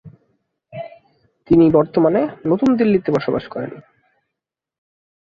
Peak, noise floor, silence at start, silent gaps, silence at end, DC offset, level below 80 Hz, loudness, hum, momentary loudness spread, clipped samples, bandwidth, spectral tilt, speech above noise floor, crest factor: -2 dBFS; -83 dBFS; 0.05 s; none; 1.6 s; under 0.1%; -50 dBFS; -17 LUFS; none; 21 LU; under 0.1%; 6.8 kHz; -9 dB/octave; 67 dB; 18 dB